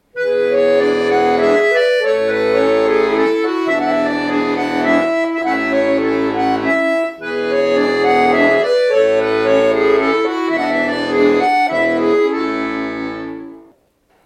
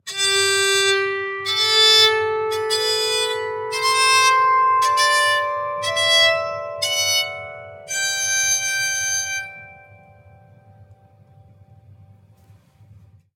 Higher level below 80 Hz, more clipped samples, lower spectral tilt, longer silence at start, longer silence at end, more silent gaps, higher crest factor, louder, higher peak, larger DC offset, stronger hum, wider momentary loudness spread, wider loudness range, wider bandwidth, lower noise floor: first, -52 dBFS vs -68 dBFS; neither; first, -5 dB/octave vs 0.5 dB/octave; about the same, 0.15 s vs 0.05 s; second, 0.65 s vs 3.6 s; neither; second, 14 dB vs 20 dB; about the same, -15 LUFS vs -17 LUFS; about the same, -2 dBFS vs -2 dBFS; neither; neither; second, 6 LU vs 12 LU; second, 2 LU vs 8 LU; second, 9.8 kHz vs 17.5 kHz; first, -57 dBFS vs -51 dBFS